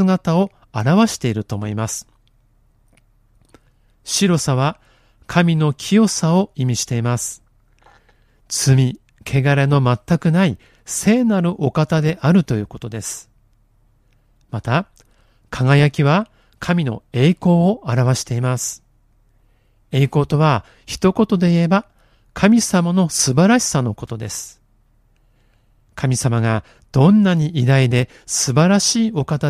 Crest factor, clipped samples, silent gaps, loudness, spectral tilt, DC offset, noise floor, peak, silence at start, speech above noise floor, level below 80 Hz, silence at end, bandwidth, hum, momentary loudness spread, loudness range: 18 dB; under 0.1%; none; -17 LUFS; -5.5 dB/octave; under 0.1%; -57 dBFS; 0 dBFS; 0 s; 40 dB; -48 dBFS; 0 s; 15 kHz; none; 13 LU; 6 LU